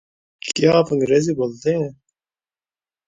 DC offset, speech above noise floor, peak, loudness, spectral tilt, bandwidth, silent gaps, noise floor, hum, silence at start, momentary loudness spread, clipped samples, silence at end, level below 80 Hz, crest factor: under 0.1%; over 72 dB; -2 dBFS; -19 LUFS; -5.5 dB/octave; 9.6 kHz; none; under -90 dBFS; none; 0.45 s; 11 LU; under 0.1%; 1.15 s; -58 dBFS; 18 dB